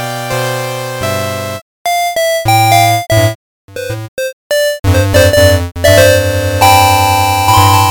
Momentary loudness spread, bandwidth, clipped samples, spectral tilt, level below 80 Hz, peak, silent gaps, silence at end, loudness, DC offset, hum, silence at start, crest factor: 14 LU; 19.5 kHz; 0.1%; -4 dB/octave; -30 dBFS; 0 dBFS; 1.62-1.85 s, 3.35-3.68 s, 4.08-4.17 s, 4.33-4.50 s; 0 s; -10 LUFS; under 0.1%; none; 0 s; 10 dB